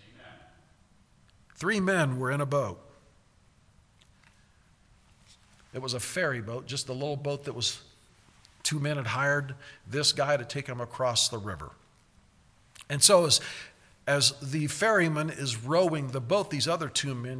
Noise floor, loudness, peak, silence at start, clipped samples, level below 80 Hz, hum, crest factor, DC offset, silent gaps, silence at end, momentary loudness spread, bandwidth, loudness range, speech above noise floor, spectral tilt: -62 dBFS; -27 LUFS; -6 dBFS; 0.2 s; under 0.1%; -64 dBFS; none; 24 dB; under 0.1%; none; 0 s; 14 LU; 11 kHz; 11 LU; 34 dB; -3 dB/octave